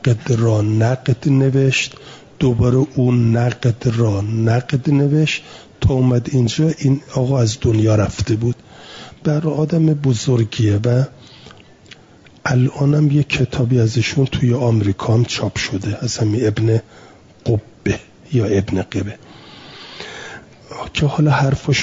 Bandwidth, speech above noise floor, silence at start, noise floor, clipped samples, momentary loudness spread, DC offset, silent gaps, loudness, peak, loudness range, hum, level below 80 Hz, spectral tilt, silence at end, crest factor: 7.8 kHz; 30 dB; 0.05 s; -46 dBFS; under 0.1%; 11 LU; under 0.1%; none; -17 LUFS; -4 dBFS; 5 LU; none; -42 dBFS; -6.5 dB/octave; 0 s; 12 dB